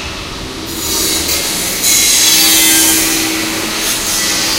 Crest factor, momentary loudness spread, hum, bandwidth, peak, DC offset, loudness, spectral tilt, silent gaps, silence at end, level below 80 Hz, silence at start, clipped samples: 12 dB; 15 LU; none; over 20 kHz; 0 dBFS; under 0.1%; -9 LUFS; -0.5 dB/octave; none; 0 s; -34 dBFS; 0 s; 0.1%